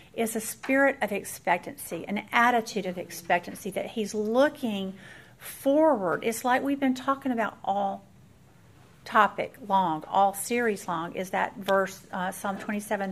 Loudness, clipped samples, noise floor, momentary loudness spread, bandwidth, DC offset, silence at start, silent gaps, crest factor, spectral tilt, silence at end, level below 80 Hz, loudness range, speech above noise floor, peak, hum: -27 LUFS; under 0.1%; -56 dBFS; 11 LU; 15.5 kHz; under 0.1%; 0.15 s; none; 22 dB; -4.5 dB/octave; 0 s; -66 dBFS; 2 LU; 28 dB; -6 dBFS; none